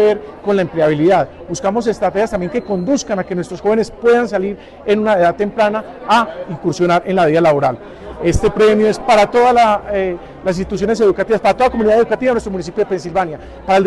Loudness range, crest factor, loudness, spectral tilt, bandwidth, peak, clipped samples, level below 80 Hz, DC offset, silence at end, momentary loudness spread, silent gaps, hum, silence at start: 3 LU; 10 dB; -15 LUFS; -6 dB/octave; 12 kHz; -4 dBFS; under 0.1%; -36 dBFS; under 0.1%; 0 s; 10 LU; none; none; 0 s